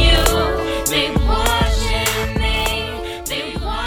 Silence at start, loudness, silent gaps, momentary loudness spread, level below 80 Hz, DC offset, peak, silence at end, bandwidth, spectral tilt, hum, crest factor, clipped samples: 0 s; -18 LUFS; none; 8 LU; -22 dBFS; under 0.1%; 0 dBFS; 0 s; 19.5 kHz; -3.5 dB/octave; none; 16 dB; under 0.1%